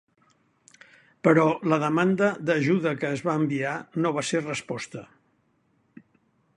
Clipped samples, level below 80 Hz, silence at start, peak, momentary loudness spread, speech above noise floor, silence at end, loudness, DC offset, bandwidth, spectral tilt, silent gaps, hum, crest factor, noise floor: under 0.1%; -68 dBFS; 1.25 s; -4 dBFS; 11 LU; 44 dB; 1.5 s; -25 LUFS; under 0.1%; 11 kHz; -6 dB/octave; none; none; 22 dB; -68 dBFS